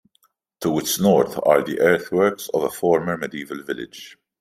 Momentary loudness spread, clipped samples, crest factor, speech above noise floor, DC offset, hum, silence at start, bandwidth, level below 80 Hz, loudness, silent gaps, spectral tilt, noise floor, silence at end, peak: 13 LU; under 0.1%; 20 dB; 45 dB; under 0.1%; none; 0.6 s; 16 kHz; -62 dBFS; -20 LUFS; none; -4.5 dB/octave; -65 dBFS; 0.3 s; -2 dBFS